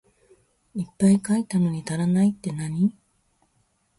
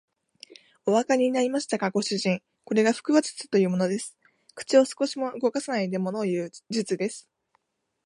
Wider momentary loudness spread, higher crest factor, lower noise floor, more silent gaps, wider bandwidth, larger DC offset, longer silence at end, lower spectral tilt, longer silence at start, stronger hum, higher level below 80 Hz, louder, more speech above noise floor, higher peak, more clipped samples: about the same, 12 LU vs 10 LU; about the same, 16 dB vs 20 dB; second, -68 dBFS vs -72 dBFS; neither; about the same, 11.5 kHz vs 11.5 kHz; neither; first, 1.1 s vs 0.85 s; first, -7 dB/octave vs -5 dB/octave; first, 0.75 s vs 0.5 s; neither; first, -60 dBFS vs -78 dBFS; first, -23 LUFS vs -26 LUFS; about the same, 46 dB vs 47 dB; about the same, -8 dBFS vs -6 dBFS; neither